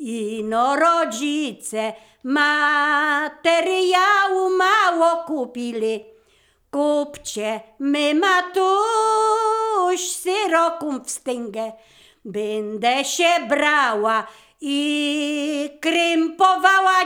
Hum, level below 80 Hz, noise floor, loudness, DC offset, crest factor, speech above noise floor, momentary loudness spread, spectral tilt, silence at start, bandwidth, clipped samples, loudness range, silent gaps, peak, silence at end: none; -66 dBFS; -60 dBFS; -19 LUFS; under 0.1%; 18 dB; 40 dB; 11 LU; -2 dB/octave; 0 s; 19 kHz; under 0.1%; 5 LU; none; -2 dBFS; 0 s